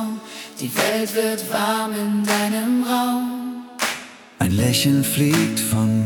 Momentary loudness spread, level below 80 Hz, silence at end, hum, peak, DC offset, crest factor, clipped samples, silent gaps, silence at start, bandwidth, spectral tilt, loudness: 12 LU; -56 dBFS; 0 s; none; -2 dBFS; under 0.1%; 18 dB; under 0.1%; none; 0 s; 18 kHz; -4.5 dB/octave; -20 LUFS